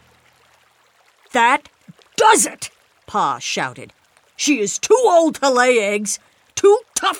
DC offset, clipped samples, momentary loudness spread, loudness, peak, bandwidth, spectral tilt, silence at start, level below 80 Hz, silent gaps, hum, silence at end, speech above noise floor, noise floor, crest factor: under 0.1%; under 0.1%; 14 LU; -16 LUFS; 0 dBFS; 17 kHz; -2 dB/octave; 1.35 s; -64 dBFS; none; none; 0 s; 40 dB; -56 dBFS; 18 dB